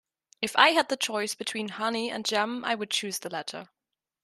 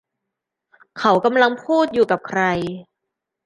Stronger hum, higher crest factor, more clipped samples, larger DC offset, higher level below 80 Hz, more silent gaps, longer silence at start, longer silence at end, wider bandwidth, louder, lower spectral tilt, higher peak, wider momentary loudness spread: neither; first, 26 dB vs 18 dB; neither; neither; second, -78 dBFS vs -58 dBFS; neither; second, 0.4 s vs 0.95 s; about the same, 0.6 s vs 0.65 s; first, 13.5 kHz vs 10.5 kHz; second, -27 LUFS vs -18 LUFS; second, -2 dB/octave vs -6 dB/octave; about the same, -4 dBFS vs -2 dBFS; first, 14 LU vs 9 LU